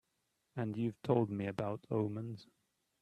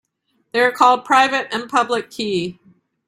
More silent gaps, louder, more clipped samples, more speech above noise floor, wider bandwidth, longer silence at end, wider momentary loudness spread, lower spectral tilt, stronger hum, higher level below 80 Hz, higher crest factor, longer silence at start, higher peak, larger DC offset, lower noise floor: neither; second, -38 LUFS vs -17 LUFS; neither; second, 46 dB vs 50 dB; second, 11 kHz vs 16 kHz; about the same, 0.6 s vs 0.55 s; first, 13 LU vs 10 LU; first, -9 dB/octave vs -3.5 dB/octave; neither; second, -74 dBFS vs -64 dBFS; about the same, 22 dB vs 18 dB; about the same, 0.55 s vs 0.55 s; second, -16 dBFS vs -2 dBFS; neither; first, -83 dBFS vs -67 dBFS